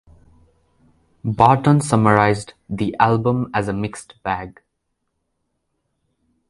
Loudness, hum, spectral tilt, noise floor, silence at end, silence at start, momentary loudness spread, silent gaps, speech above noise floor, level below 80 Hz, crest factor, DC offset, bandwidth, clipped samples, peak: -18 LUFS; none; -6.5 dB/octave; -74 dBFS; 2 s; 1.25 s; 15 LU; none; 56 dB; -48 dBFS; 20 dB; under 0.1%; 11.5 kHz; under 0.1%; 0 dBFS